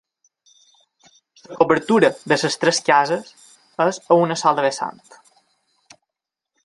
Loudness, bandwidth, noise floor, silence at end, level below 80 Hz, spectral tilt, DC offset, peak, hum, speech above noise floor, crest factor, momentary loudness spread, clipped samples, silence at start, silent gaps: -18 LUFS; 11.5 kHz; -85 dBFS; 1.75 s; -68 dBFS; -4 dB/octave; under 0.1%; 0 dBFS; none; 67 dB; 20 dB; 12 LU; under 0.1%; 1.5 s; none